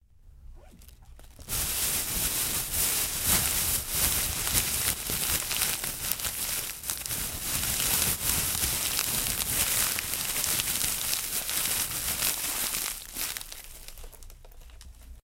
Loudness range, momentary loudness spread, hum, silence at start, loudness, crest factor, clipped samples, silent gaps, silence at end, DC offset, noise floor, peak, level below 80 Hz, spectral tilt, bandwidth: 4 LU; 8 LU; none; 0.25 s; -26 LUFS; 28 dB; under 0.1%; none; 0.1 s; under 0.1%; -51 dBFS; -2 dBFS; -44 dBFS; -0.5 dB/octave; 17 kHz